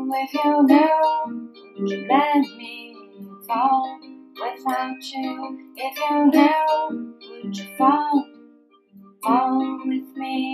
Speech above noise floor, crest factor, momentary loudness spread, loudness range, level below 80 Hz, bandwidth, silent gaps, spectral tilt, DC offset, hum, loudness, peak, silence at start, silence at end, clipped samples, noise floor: 33 dB; 18 dB; 21 LU; 5 LU; -84 dBFS; 14.5 kHz; none; -5.5 dB/octave; under 0.1%; none; -21 LUFS; -4 dBFS; 0 s; 0 s; under 0.1%; -53 dBFS